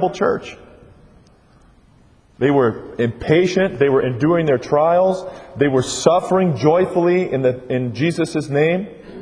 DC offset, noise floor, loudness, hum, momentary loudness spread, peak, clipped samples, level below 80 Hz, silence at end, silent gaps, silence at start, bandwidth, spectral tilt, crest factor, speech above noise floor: under 0.1%; -51 dBFS; -17 LUFS; none; 7 LU; 0 dBFS; under 0.1%; -50 dBFS; 0 s; none; 0 s; 10.5 kHz; -6 dB/octave; 18 dB; 34 dB